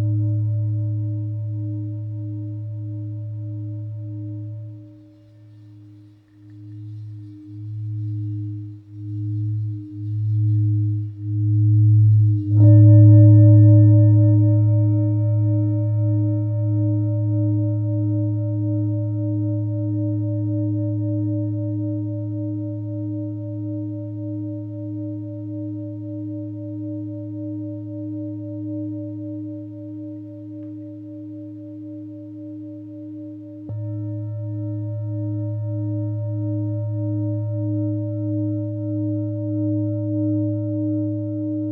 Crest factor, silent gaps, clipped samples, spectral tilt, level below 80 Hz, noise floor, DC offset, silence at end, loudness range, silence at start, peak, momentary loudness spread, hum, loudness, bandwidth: 18 dB; none; under 0.1%; -14.5 dB/octave; -68 dBFS; -47 dBFS; under 0.1%; 0 s; 20 LU; 0 s; -2 dBFS; 20 LU; none; -21 LUFS; 1 kHz